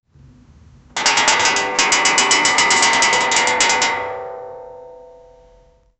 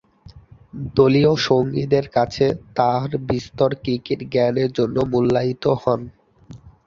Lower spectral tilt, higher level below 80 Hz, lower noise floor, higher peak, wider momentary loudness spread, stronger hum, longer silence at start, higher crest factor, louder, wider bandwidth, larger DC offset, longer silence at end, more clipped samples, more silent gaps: second, 0.5 dB/octave vs -7 dB/octave; about the same, -52 dBFS vs -48 dBFS; first, -51 dBFS vs -46 dBFS; about the same, 0 dBFS vs -2 dBFS; first, 17 LU vs 8 LU; neither; first, 0.95 s vs 0.35 s; about the same, 18 dB vs 18 dB; first, -14 LUFS vs -20 LUFS; first, 10.5 kHz vs 7.4 kHz; neither; first, 1 s vs 0.15 s; neither; neither